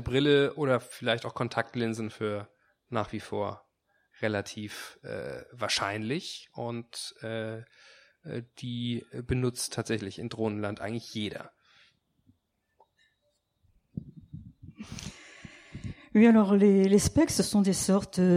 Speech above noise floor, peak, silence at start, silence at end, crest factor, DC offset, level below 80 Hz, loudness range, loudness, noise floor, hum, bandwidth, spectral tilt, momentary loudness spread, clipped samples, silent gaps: 48 dB; -10 dBFS; 0 s; 0 s; 20 dB; under 0.1%; -56 dBFS; 21 LU; -29 LUFS; -76 dBFS; none; 15.5 kHz; -5 dB/octave; 22 LU; under 0.1%; none